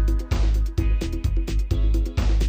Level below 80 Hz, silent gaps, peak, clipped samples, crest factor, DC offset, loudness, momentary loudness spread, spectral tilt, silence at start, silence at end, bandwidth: -22 dBFS; none; -10 dBFS; under 0.1%; 10 dB; under 0.1%; -25 LUFS; 3 LU; -6.5 dB/octave; 0 s; 0 s; 15 kHz